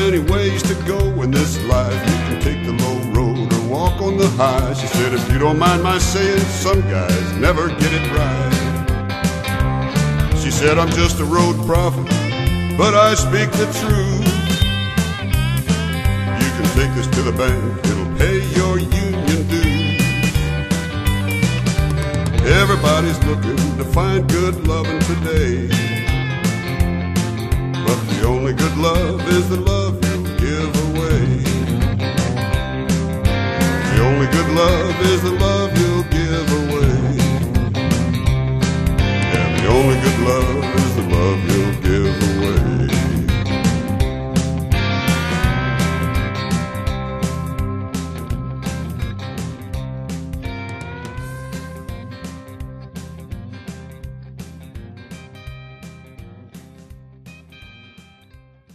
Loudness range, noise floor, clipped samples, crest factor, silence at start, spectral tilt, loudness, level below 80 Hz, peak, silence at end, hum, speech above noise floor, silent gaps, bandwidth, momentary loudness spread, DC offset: 12 LU; -47 dBFS; under 0.1%; 16 dB; 0 s; -5.5 dB/octave; -17 LUFS; -26 dBFS; -2 dBFS; 1.05 s; none; 32 dB; none; 14 kHz; 13 LU; under 0.1%